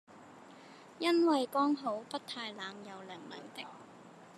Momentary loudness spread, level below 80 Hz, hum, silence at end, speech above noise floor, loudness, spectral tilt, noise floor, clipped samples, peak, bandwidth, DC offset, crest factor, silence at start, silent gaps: 25 LU; under -90 dBFS; none; 0 s; 21 dB; -34 LUFS; -4 dB/octave; -55 dBFS; under 0.1%; -18 dBFS; 13 kHz; under 0.1%; 18 dB; 0.1 s; none